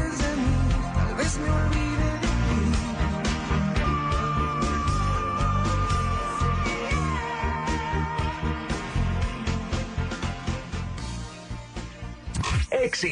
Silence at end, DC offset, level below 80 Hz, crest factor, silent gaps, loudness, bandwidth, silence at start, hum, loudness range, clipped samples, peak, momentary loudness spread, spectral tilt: 0 s; under 0.1%; -30 dBFS; 12 dB; none; -27 LUFS; 10.5 kHz; 0 s; none; 5 LU; under 0.1%; -12 dBFS; 9 LU; -5.5 dB/octave